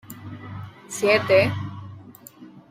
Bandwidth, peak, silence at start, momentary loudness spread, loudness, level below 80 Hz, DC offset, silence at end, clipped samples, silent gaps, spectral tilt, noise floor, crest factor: 16 kHz; -4 dBFS; 0.1 s; 23 LU; -20 LUFS; -62 dBFS; under 0.1%; 0.1 s; under 0.1%; none; -4.5 dB/octave; -46 dBFS; 20 dB